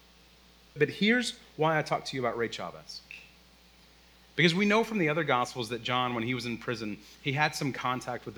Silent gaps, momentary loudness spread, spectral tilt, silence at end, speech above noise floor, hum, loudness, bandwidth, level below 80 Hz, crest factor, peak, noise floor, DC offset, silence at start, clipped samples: none; 14 LU; -5 dB/octave; 0 s; 29 dB; none; -29 LUFS; over 20 kHz; -64 dBFS; 22 dB; -10 dBFS; -58 dBFS; under 0.1%; 0.75 s; under 0.1%